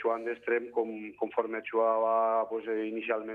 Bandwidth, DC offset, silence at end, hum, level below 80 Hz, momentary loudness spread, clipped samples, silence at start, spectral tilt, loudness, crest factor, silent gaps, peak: 4.2 kHz; under 0.1%; 0 s; 50 Hz at -75 dBFS; -80 dBFS; 7 LU; under 0.1%; 0 s; -7 dB/octave; -31 LUFS; 16 dB; none; -14 dBFS